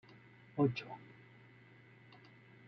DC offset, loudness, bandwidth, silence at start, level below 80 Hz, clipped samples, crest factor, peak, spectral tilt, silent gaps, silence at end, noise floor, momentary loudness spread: under 0.1%; -38 LUFS; 6.4 kHz; 0.55 s; -80 dBFS; under 0.1%; 22 dB; -22 dBFS; -6.5 dB/octave; none; 1.6 s; -61 dBFS; 26 LU